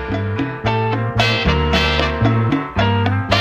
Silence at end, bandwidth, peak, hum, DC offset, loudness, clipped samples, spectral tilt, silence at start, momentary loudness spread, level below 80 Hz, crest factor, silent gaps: 0 s; 8.6 kHz; -2 dBFS; none; under 0.1%; -17 LUFS; under 0.1%; -6 dB/octave; 0 s; 6 LU; -28 dBFS; 16 dB; none